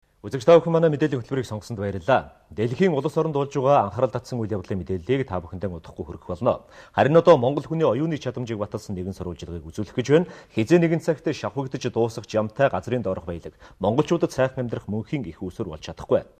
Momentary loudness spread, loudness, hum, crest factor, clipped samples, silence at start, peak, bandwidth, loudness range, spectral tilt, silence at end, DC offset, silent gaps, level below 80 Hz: 15 LU; -23 LUFS; none; 20 dB; under 0.1%; 0.25 s; -4 dBFS; 13.5 kHz; 4 LU; -7 dB/octave; 0.15 s; under 0.1%; none; -52 dBFS